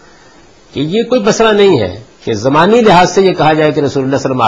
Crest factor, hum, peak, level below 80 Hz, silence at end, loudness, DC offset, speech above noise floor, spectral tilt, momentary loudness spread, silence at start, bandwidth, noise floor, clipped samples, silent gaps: 10 dB; none; 0 dBFS; -42 dBFS; 0 s; -10 LUFS; under 0.1%; 32 dB; -5.5 dB/octave; 13 LU; 0.75 s; 8.8 kHz; -41 dBFS; under 0.1%; none